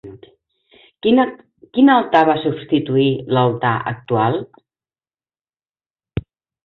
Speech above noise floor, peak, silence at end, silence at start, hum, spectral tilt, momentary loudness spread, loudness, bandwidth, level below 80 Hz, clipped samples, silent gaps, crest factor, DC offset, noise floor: over 74 dB; -2 dBFS; 0.45 s; 0.05 s; none; -9 dB/octave; 13 LU; -17 LUFS; 4.9 kHz; -50 dBFS; under 0.1%; 5.90-5.94 s; 18 dB; under 0.1%; under -90 dBFS